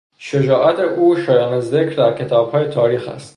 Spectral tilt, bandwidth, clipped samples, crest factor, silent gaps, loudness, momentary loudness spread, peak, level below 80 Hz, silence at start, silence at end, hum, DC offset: -7.5 dB/octave; 11 kHz; under 0.1%; 14 dB; none; -16 LUFS; 4 LU; -2 dBFS; -58 dBFS; 0.2 s; 0.05 s; none; under 0.1%